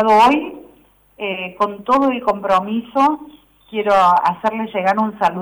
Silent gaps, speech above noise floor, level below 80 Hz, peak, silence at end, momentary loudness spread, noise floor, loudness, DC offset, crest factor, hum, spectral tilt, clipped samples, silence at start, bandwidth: none; 35 dB; -54 dBFS; -6 dBFS; 0 s; 12 LU; -51 dBFS; -17 LUFS; under 0.1%; 10 dB; 50 Hz at -60 dBFS; -5.5 dB/octave; under 0.1%; 0 s; over 20 kHz